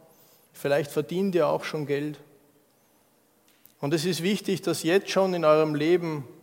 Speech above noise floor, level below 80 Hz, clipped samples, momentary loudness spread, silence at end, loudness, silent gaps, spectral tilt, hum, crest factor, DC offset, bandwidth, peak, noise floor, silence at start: 39 dB; -78 dBFS; under 0.1%; 11 LU; 0.1 s; -26 LUFS; none; -5.5 dB/octave; none; 18 dB; under 0.1%; 17 kHz; -8 dBFS; -64 dBFS; 0.55 s